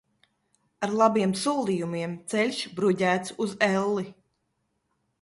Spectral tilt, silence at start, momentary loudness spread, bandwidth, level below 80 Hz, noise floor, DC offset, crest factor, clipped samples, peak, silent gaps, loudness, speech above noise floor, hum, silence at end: -5 dB/octave; 0.8 s; 10 LU; 11.5 kHz; -70 dBFS; -76 dBFS; under 0.1%; 20 dB; under 0.1%; -8 dBFS; none; -26 LUFS; 50 dB; none; 1.1 s